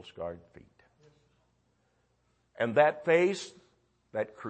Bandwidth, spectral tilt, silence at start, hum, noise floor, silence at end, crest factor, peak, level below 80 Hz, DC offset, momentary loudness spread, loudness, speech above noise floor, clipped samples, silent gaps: 8.8 kHz; -5.5 dB/octave; 0.05 s; none; -73 dBFS; 0 s; 24 dB; -10 dBFS; -72 dBFS; under 0.1%; 17 LU; -29 LUFS; 44 dB; under 0.1%; none